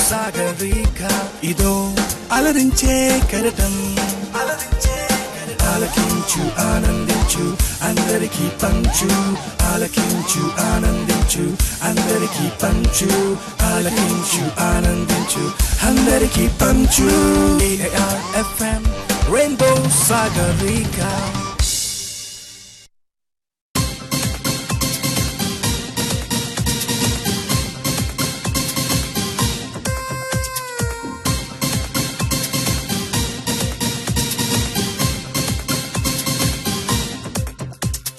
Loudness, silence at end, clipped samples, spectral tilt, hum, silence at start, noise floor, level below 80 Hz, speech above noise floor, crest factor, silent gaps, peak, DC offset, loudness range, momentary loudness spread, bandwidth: -18 LUFS; 0 s; under 0.1%; -4 dB/octave; none; 0 s; -83 dBFS; -26 dBFS; 66 dB; 16 dB; 23.61-23.74 s; -2 dBFS; under 0.1%; 6 LU; 7 LU; 13 kHz